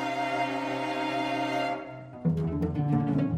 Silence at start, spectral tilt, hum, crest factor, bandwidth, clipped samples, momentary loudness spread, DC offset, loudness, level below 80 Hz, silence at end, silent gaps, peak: 0 s; -7 dB/octave; none; 16 dB; 12.5 kHz; under 0.1%; 6 LU; under 0.1%; -29 LUFS; -52 dBFS; 0 s; none; -14 dBFS